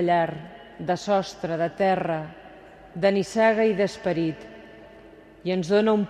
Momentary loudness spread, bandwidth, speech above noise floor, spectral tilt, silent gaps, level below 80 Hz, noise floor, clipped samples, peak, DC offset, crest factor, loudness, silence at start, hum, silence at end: 19 LU; 11.5 kHz; 25 dB; -6 dB/octave; none; -60 dBFS; -48 dBFS; under 0.1%; -8 dBFS; under 0.1%; 16 dB; -24 LUFS; 0 s; none; 0 s